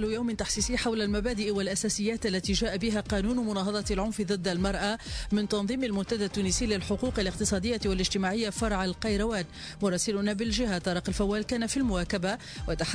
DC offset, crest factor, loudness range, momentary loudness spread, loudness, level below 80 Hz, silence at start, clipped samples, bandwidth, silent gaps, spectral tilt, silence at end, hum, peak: under 0.1%; 14 dB; 1 LU; 3 LU; -29 LUFS; -40 dBFS; 0 s; under 0.1%; 11 kHz; none; -4 dB/octave; 0 s; none; -16 dBFS